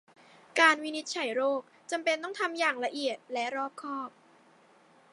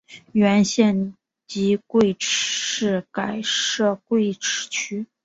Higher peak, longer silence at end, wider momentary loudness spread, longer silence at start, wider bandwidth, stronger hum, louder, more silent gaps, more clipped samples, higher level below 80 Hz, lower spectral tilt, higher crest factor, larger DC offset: second, -8 dBFS vs -4 dBFS; first, 1.05 s vs 0.2 s; first, 14 LU vs 8 LU; first, 0.55 s vs 0.1 s; first, 11.5 kHz vs 8 kHz; neither; second, -30 LUFS vs -21 LUFS; neither; neither; second, under -90 dBFS vs -60 dBFS; second, -1 dB/octave vs -3.5 dB/octave; first, 24 dB vs 18 dB; neither